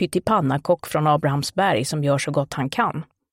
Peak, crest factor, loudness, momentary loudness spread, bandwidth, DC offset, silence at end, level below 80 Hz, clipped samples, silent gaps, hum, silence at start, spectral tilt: -6 dBFS; 16 dB; -21 LUFS; 4 LU; 16.5 kHz; under 0.1%; 0.3 s; -54 dBFS; under 0.1%; none; none; 0 s; -5.5 dB/octave